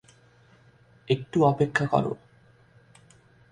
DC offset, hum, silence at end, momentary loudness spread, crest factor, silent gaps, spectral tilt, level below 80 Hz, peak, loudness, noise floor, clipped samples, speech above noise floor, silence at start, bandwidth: under 0.1%; none; 1.35 s; 10 LU; 22 dB; none; -7 dB/octave; -60 dBFS; -6 dBFS; -25 LUFS; -58 dBFS; under 0.1%; 34 dB; 1.1 s; 10.5 kHz